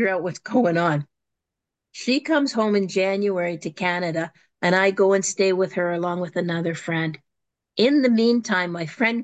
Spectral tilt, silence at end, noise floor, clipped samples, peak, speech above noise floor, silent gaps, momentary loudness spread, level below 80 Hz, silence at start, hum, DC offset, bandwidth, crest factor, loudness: -5 dB/octave; 0 s; -85 dBFS; under 0.1%; -6 dBFS; 63 dB; none; 10 LU; -72 dBFS; 0 s; none; under 0.1%; 9.2 kHz; 16 dB; -22 LUFS